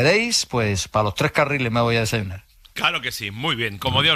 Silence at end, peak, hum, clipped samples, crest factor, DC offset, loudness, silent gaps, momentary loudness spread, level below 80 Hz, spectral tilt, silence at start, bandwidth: 0 s; -4 dBFS; none; under 0.1%; 16 dB; under 0.1%; -21 LUFS; none; 8 LU; -46 dBFS; -3.5 dB/octave; 0 s; 15 kHz